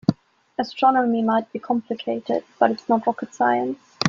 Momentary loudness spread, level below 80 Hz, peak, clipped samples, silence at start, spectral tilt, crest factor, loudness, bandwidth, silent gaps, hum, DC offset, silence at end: 10 LU; -62 dBFS; -2 dBFS; under 0.1%; 0.1 s; -6 dB/octave; 20 dB; -22 LUFS; 7.4 kHz; none; none; under 0.1%; 0 s